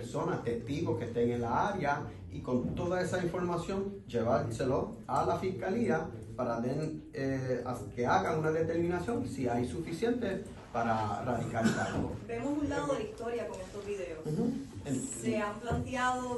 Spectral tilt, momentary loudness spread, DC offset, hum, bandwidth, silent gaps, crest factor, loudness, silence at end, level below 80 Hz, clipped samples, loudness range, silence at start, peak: -6 dB/octave; 7 LU; under 0.1%; none; 12 kHz; none; 18 dB; -34 LUFS; 0 s; -54 dBFS; under 0.1%; 3 LU; 0 s; -16 dBFS